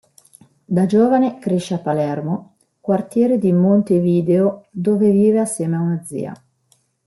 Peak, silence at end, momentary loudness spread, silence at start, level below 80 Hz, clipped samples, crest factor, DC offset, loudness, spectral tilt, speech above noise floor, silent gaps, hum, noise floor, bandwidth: -4 dBFS; 0.75 s; 11 LU; 0.7 s; -62 dBFS; under 0.1%; 14 dB; under 0.1%; -18 LUFS; -8 dB/octave; 45 dB; none; none; -61 dBFS; 12 kHz